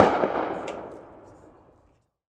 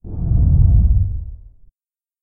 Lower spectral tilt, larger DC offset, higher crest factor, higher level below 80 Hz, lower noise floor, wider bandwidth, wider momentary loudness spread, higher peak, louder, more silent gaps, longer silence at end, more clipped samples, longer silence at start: second, -6 dB/octave vs -16 dB/octave; neither; first, 26 dB vs 14 dB; second, -60 dBFS vs -18 dBFS; second, -64 dBFS vs under -90 dBFS; first, 9.8 kHz vs 1.2 kHz; first, 25 LU vs 15 LU; about the same, -2 dBFS vs -2 dBFS; second, -27 LUFS vs -16 LUFS; neither; first, 1.2 s vs 0.85 s; neither; about the same, 0 s vs 0.05 s